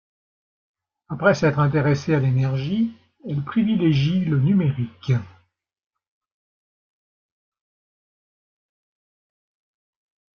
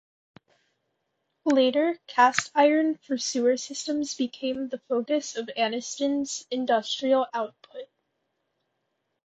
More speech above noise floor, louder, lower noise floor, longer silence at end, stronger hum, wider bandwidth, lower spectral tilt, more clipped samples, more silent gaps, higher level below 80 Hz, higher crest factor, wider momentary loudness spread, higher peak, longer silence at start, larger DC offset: first, over 70 dB vs 53 dB; first, -21 LUFS vs -26 LUFS; first, under -90 dBFS vs -78 dBFS; first, 5.1 s vs 1.4 s; neither; second, 7 kHz vs 9 kHz; first, -8 dB/octave vs -2.5 dB/octave; neither; neither; first, -58 dBFS vs -74 dBFS; about the same, 20 dB vs 24 dB; about the same, 9 LU vs 11 LU; about the same, -4 dBFS vs -4 dBFS; second, 1.1 s vs 1.45 s; neither